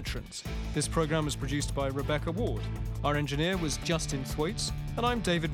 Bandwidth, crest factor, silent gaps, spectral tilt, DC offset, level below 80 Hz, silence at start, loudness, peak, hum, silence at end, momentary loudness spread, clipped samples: 17.5 kHz; 16 dB; none; -4.5 dB/octave; under 0.1%; -40 dBFS; 0 s; -31 LUFS; -14 dBFS; none; 0 s; 6 LU; under 0.1%